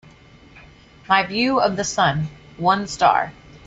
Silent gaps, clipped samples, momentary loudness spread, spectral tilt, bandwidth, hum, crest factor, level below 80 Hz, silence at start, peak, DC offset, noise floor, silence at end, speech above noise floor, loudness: none; under 0.1%; 8 LU; -4 dB/octave; 8.2 kHz; none; 18 dB; -50 dBFS; 0.55 s; -2 dBFS; under 0.1%; -47 dBFS; 0.1 s; 28 dB; -20 LUFS